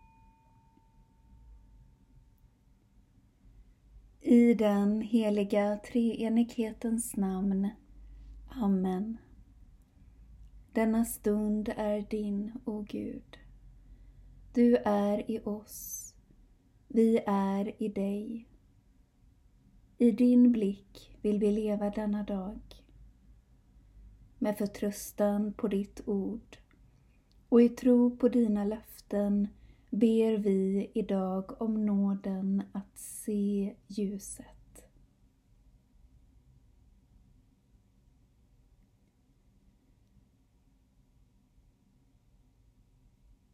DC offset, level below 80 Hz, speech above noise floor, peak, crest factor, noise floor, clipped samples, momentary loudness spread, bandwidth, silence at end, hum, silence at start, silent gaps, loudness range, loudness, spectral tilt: under 0.1%; -58 dBFS; 38 dB; -12 dBFS; 20 dB; -67 dBFS; under 0.1%; 15 LU; 15.5 kHz; 8.75 s; none; 1.5 s; none; 8 LU; -30 LUFS; -7 dB/octave